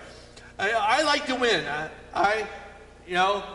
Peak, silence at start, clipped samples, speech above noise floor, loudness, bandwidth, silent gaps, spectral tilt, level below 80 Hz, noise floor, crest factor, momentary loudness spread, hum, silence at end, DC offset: -10 dBFS; 0 s; under 0.1%; 21 dB; -25 LUFS; 11.5 kHz; none; -3 dB/octave; -54 dBFS; -47 dBFS; 16 dB; 16 LU; 60 Hz at -55 dBFS; 0 s; under 0.1%